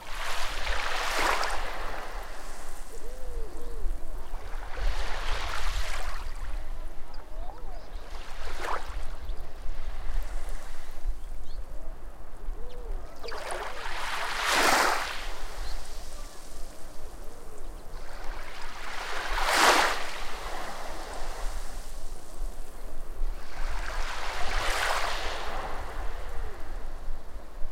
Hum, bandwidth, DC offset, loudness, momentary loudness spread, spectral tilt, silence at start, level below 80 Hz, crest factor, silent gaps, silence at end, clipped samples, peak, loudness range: none; 15.5 kHz; under 0.1%; -32 LUFS; 19 LU; -2.5 dB/octave; 0 s; -34 dBFS; 20 dB; none; 0 s; under 0.1%; -6 dBFS; 14 LU